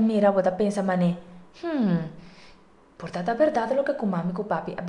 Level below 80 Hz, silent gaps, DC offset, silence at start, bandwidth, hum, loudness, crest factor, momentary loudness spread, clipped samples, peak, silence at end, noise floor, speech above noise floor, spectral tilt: -60 dBFS; none; under 0.1%; 0 s; 10.5 kHz; none; -25 LUFS; 18 dB; 14 LU; under 0.1%; -8 dBFS; 0 s; -53 dBFS; 29 dB; -8 dB/octave